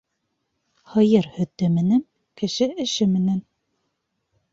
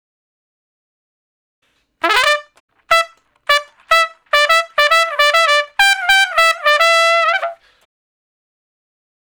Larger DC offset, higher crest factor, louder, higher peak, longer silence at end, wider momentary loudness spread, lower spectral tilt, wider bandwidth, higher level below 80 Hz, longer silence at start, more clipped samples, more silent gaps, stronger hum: neither; about the same, 18 dB vs 16 dB; second, -22 LUFS vs -13 LUFS; second, -4 dBFS vs 0 dBFS; second, 1.1 s vs 1.7 s; about the same, 10 LU vs 8 LU; first, -6.5 dB/octave vs 1.5 dB/octave; second, 7.8 kHz vs over 20 kHz; second, -62 dBFS vs -54 dBFS; second, 0.9 s vs 2.05 s; neither; second, none vs 2.60-2.68 s; neither